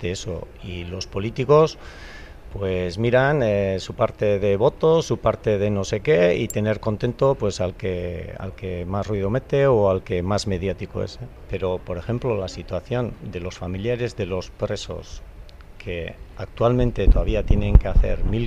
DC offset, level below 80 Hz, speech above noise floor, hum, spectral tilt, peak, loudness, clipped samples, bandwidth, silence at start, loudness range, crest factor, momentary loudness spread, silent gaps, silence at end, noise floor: under 0.1%; -28 dBFS; 19 dB; none; -6.5 dB/octave; 0 dBFS; -23 LUFS; under 0.1%; 13.5 kHz; 0 s; 7 LU; 20 dB; 15 LU; none; 0 s; -41 dBFS